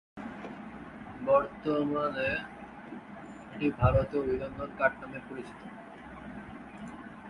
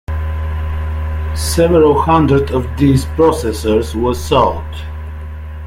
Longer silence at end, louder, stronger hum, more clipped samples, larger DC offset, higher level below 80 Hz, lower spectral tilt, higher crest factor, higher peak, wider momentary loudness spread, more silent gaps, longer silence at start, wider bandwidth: about the same, 0 s vs 0 s; second, -31 LUFS vs -14 LUFS; neither; neither; neither; second, -48 dBFS vs -26 dBFS; first, -8.5 dB/octave vs -6.5 dB/octave; first, 22 dB vs 14 dB; second, -12 dBFS vs 0 dBFS; first, 19 LU vs 16 LU; neither; about the same, 0.15 s vs 0.1 s; second, 11 kHz vs 16 kHz